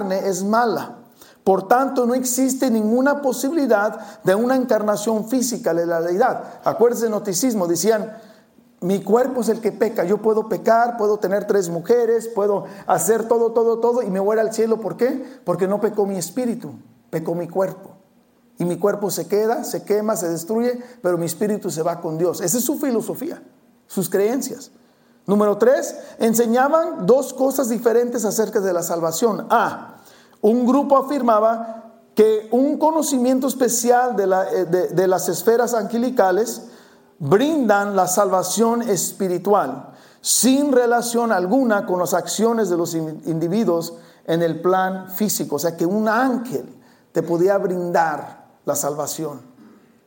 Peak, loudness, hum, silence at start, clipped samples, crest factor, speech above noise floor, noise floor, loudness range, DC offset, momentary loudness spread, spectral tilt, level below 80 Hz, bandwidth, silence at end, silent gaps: -2 dBFS; -19 LUFS; none; 0 s; under 0.1%; 18 dB; 37 dB; -56 dBFS; 4 LU; under 0.1%; 9 LU; -4.5 dB/octave; -68 dBFS; 17 kHz; 0.65 s; none